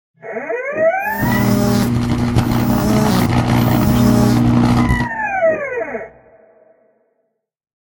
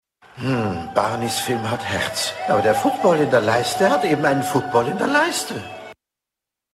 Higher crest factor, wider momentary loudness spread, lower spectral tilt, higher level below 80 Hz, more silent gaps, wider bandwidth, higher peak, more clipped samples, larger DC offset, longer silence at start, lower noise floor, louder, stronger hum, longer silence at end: about the same, 16 dB vs 18 dB; first, 11 LU vs 7 LU; first, -6.5 dB/octave vs -4.5 dB/octave; first, -30 dBFS vs -54 dBFS; neither; about the same, 17 kHz vs 16 kHz; first, 0 dBFS vs -4 dBFS; neither; neither; about the same, 0.25 s vs 0.35 s; second, -69 dBFS vs -86 dBFS; first, -15 LUFS vs -20 LUFS; neither; first, 1.8 s vs 0.8 s